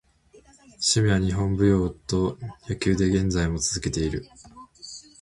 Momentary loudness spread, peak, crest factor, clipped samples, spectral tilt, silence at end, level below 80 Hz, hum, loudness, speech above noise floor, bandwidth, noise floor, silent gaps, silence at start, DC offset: 17 LU; -8 dBFS; 18 dB; under 0.1%; -5 dB/octave; 0.2 s; -38 dBFS; none; -24 LUFS; 32 dB; 11.5 kHz; -55 dBFS; none; 0.8 s; under 0.1%